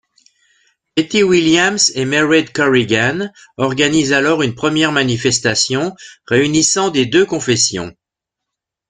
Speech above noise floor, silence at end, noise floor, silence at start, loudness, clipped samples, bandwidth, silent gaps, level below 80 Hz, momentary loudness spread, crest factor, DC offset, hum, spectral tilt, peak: 67 dB; 0.95 s; -82 dBFS; 0.95 s; -14 LUFS; under 0.1%; 9.8 kHz; none; -50 dBFS; 8 LU; 16 dB; under 0.1%; none; -3.5 dB/octave; 0 dBFS